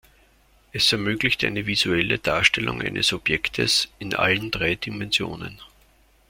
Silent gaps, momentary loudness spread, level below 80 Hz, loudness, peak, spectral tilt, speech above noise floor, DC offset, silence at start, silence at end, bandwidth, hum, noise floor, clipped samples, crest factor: none; 8 LU; -48 dBFS; -22 LUFS; -2 dBFS; -3 dB/octave; 34 dB; under 0.1%; 0.75 s; 0.65 s; 16.5 kHz; none; -58 dBFS; under 0.1%; 22 dB